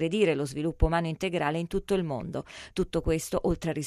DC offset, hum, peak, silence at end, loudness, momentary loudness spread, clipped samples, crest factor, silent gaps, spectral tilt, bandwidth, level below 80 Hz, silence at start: under 0.1%; none; -10 dBFS; 0 s; -29 LUFS; 8 LU; under 0.1%; 18 dB; none; -6 dB/octave; 15 kHz; -38 dBFS; 0 s